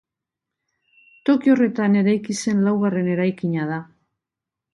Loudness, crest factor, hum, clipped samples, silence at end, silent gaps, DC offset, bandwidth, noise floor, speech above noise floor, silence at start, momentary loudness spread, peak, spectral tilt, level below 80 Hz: -20 LUFS; 16 dB; none; under 0.1%; 0.9 s; none; under 0.1%; 11.5 kHz; -86 dBFS; 67 dB; 1.25 s; 8 LU; -4 dBFS; -6.5 dB/octave; -66 dBFS